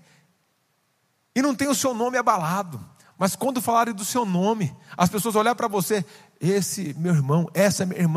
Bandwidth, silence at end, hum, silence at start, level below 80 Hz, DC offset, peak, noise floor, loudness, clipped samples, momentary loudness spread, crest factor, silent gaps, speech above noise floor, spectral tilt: 15.5 kHz; 0 s; none; 1.35 s; -66 dBFS; under 0.1%; -4 dBFS; -69 dBFS; -23 LUFS; under 0.1%; 7 LU; 20 dB; none; 46 dB; -5 dB/octave